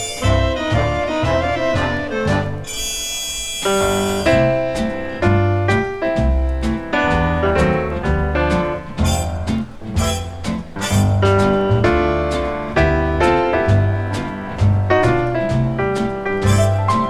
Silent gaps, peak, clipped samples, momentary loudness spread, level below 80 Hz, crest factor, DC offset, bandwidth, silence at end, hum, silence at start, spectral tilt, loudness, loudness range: none; -2 dBFS; under 0.1%; 7 LU; -28 dBFS; 16 dB; under 0.1%; 14 kHz; 0 s; none; 0 s; -5.5 dB/octave; -18 LUFS; 3 LU